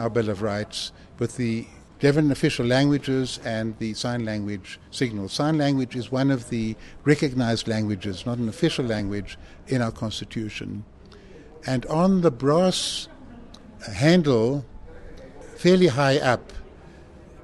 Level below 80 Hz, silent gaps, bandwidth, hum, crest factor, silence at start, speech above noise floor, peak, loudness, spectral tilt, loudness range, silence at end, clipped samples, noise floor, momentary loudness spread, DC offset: -48 dBFS; none; 12.5 kHz; none; 20 dB; 0 s; 22 dB; -4 dBFS; -24 LUFS; -6 dB/octave; 5 LU; 0 s; under 0.1%; -46 dBFS; 16 LU; under 0.1%